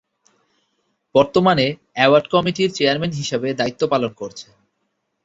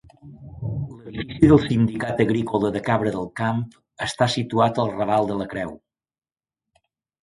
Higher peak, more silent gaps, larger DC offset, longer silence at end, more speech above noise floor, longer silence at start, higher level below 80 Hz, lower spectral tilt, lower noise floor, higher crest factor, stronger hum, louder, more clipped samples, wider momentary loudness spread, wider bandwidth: about the same, -2 dBFS vs -2 dBFS; neither; neither; second, 0.8 s vs 1.45 s; second, 54 dB vs over 69 dB; first, 1.15 s vs 0.25 s; second, -56 dBFS vs -46 dBFS; second, -5 dB/octave vs -7 dB/octave; second, -72 dBFS vs under -90 dBFS; about the same, 18 dB vs 22 dB; neither; first, -18 LUFS vs -22 LUFS; neither; second, 10 LU vs 16 LU; second, 8 kHz vs 11.5 kHz